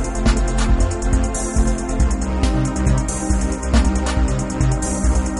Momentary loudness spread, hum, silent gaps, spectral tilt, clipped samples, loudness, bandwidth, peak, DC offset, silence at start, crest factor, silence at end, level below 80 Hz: 2 LU; none; none; -5.5 dB/octave; under 0.1%; -20 LUFS; 11.5 kHz; -2 dBFS; 0.2%; 0 s; 14 dB; 0 s; -20 dBFS